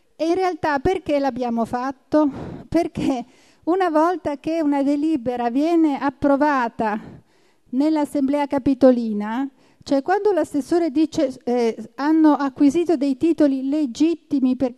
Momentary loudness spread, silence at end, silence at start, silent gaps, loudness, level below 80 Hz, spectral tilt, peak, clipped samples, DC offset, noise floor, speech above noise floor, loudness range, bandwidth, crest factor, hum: 7 LU; 0.05 s; 0.2 s; none; -20 LUFS; -52 dBFS; -6 dB/octave; -2 dBFS; under 0.1%; under 0.1%; -59 dBFS; 40 dB; 3 LU; 12 kHz; 18 dB; none